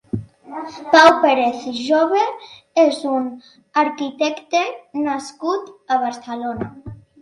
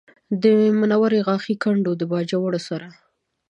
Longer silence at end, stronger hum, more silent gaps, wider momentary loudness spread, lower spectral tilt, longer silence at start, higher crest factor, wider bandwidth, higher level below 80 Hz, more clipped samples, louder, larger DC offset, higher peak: second, 0.25 s vs 0.55 s; neither; neither; first, 18 LU vs 11 LU; second, -4.5 dB/octave vs -7.5 dB/octave; second, 0.15 s vs 0.3 s; about the same, 18 dB vs 16 dB; first, 11.5 kHz vs 8.6 kHz; first, -56 dBFS vs -72 dBFS; neither; about the same, -18 LUFS vs -20 LUFS; neither; first, 0 dBFS vs -4 dBFS